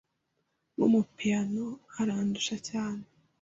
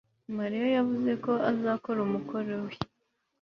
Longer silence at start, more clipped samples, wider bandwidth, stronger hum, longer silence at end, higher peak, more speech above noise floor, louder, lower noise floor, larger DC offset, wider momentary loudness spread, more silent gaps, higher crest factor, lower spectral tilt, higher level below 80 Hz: first, 0.8 s vs 0.3 s; neither; first, 8 kHz vs 6.4 kHz; neither; second, 0.4 s vs 0.55 s; about the same, -14 dBFS vs -12 dBFS; about the same, 49 dB vs 49 dB; about the same, -30 LUFS vs -30 LUFS; about the same, -79 dBFS vs -78 dBFS; neither; about the same, 12 LU vs 11 LU; neither; about the same, 18 dB vs 18 dB; second, -5 dB/octave vs -8 dB/octave; about the same, -68 dBFS vs -66 dBFS